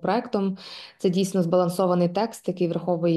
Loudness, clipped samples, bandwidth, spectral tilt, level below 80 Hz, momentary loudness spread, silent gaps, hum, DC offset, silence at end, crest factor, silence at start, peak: -24 LUFS; under 0.1%; 12.5 kHz; -7 dB/octave; -68 dBFS; 7 LU; none; none; under 0.1%; 0 s; 16 dB; 0 s; -8 dBFS